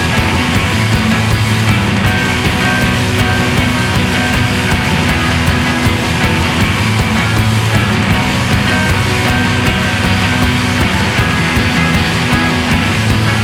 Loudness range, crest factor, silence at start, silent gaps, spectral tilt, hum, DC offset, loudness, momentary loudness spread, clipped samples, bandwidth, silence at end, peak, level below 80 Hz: 0 LU; 12 dB; 0 s; none; -5 dB/octave; none; under 0.1%; -12 LUFS; 1 LU; under 0.1%; 17 kHz; 0 s; 0 dBFS; -24 dBFS